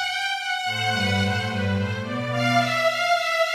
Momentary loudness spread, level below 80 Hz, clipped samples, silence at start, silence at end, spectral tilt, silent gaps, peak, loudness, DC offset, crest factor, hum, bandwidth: 5 LU; -64 dBFS; under 0.1%; 0 s; 0 s; -4.5 dB/octave; none; -10 dBFS; -23 LUFS; under 0.1%; 14 dB; none; 14 kHz